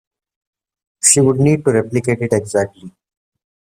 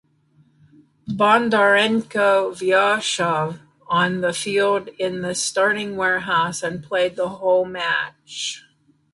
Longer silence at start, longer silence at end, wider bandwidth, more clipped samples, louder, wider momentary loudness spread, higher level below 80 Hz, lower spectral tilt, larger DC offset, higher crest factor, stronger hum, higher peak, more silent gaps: about the same, 1.05 s vs 1.05 s; first, 0.75 s vs 0.55 s; first, 15.5 kHz vs 11.5 kHz; neither; first, -15 LUFS vs -20 LUFS; second, 9 LU vs 12 LU; first, -54 dBFS vs -62 dBFS; first, -5 dB/octave vs -3.5 dB/octave; neither; about the same, 18 dB vs 18 dB; neither; first, 0 dBFS vs -4 dBFS; neither